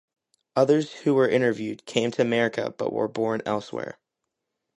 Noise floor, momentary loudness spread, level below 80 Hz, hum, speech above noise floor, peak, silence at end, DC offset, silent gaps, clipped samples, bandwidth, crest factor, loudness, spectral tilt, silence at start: -83 dBFS; 10 LU; -70 dBFS; none; 59 dB; -4 dBFS; 0.85 s; under 0.1%; none; under 0.1%; 11.5 kHz; 20 dB; -25 LUFS; -6 dB/octave; 0.55 s